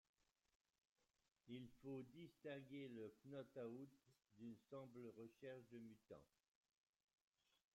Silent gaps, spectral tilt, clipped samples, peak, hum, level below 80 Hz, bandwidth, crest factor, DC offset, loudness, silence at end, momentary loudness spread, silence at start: none; -7 dB/octave; under 0.1%; -44 dBFS; none; under -90 dBFS; 13.5 kHz; 16 dB; under 0.1%; -59 LUFS; 1.5 s; 7 LU; 1.45 s